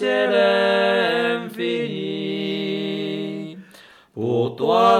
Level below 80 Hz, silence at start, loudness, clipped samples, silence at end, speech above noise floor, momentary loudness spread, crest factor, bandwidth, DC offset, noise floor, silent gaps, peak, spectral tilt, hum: -68 dBFS; 0 s; -21 LUFS; under 0.1%; 0 s; 30 dB; 13 LU; 16 dB; 14.5 kHz; under 0.1%; -48 dBFS; none; -4 dBFS; -6 dB/octave; none